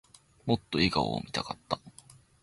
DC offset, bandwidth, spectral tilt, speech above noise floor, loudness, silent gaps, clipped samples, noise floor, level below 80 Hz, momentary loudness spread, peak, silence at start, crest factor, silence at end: under 0.1%; 11.5 kHz; -5.5 dB/octave; 27 dB; -31 LUFS; none; under 0.1%; -57 dBFS; -54 dBFS; 10 LU; -12 dBFS; 0.45 s; 22 dB; 0.55 s